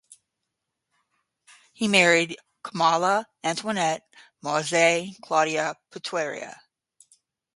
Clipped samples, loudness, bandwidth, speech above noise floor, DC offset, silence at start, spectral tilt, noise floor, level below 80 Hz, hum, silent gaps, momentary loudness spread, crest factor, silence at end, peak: under 0.1%; -23 LUFS; 11.5 kHz; 58 dB; under 0.1%; 1.8 s; -3 dB/octave; -82 dBFS; -74 dBFS; none; none; 17 LU; 22 dB; 1 s; -4 dBFS